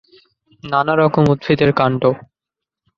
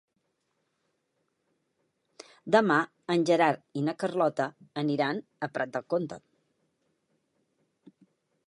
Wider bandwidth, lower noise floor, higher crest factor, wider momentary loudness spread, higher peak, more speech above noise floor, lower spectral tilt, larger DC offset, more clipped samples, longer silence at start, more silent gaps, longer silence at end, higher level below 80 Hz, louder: second, 7 kHz vs 11.5 kHz; first, -85 dBFS vs -78 dBFS; second, 16 dB vs 24 dB; second, 8 LU vs 12 LU; first, -2 dBFS vs -8 dBFS; first, 70 dB vs 50 dB; first, -8.5 dB/octave vs -6 dB/octave; neither; neither; second, 0.65 s vs 2.45 s; neither; second, 0.8 s vs 2.3 s; first, -50 dBFS vs -80 dBFS; first, -16 LUFS vs -28 LUFS